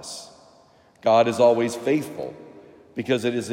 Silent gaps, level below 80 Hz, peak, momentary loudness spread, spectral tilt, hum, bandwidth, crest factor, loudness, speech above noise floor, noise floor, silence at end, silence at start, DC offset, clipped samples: none; -72 dBFS; -6 dBFS; 18 LU; -5 dB/octave; none; 16 kHz; 18 dB; -22 LUFS; 34 dB; -55 dBFS; 0 s; 0 s; under 0.1%; under 0.1%